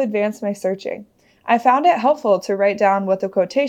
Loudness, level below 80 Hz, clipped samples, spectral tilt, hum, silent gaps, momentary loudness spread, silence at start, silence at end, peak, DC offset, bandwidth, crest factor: -18 LUFS; -72 dBFS; under 0.1%; -6 dB/octave; none; none; 12 LU; 0 s; 0 s; -2 dBFS; under 0.1%; 13.5 kHz; 16 dB